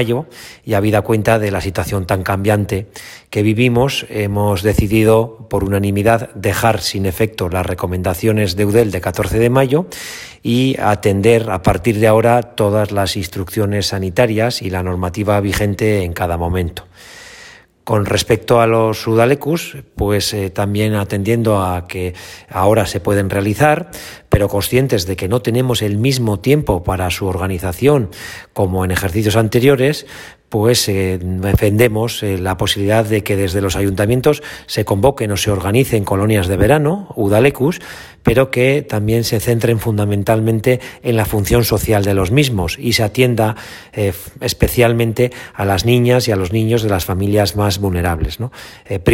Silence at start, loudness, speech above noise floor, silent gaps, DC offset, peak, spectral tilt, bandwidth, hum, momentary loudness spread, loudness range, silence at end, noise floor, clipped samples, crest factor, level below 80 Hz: 0 s; -15 LUFS; 26 dB; none; under 0.1%; 0 dBFS; -5.5 dB/octave; 16.5 kHz; none; 9 LU; 2 LU; 0 s; -41 dBFS; under 0.1%; 16 dB; -36 dBFS